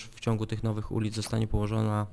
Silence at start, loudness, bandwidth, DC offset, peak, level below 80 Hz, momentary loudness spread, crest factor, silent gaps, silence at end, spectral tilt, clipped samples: 0 s; -31 LUFS; 11 kHz; under 0.1%; -14 dBFS; -42 dBFS; 3 LU; 16 dB; none; 0 s; -6.5 dB/octave; under 0.1%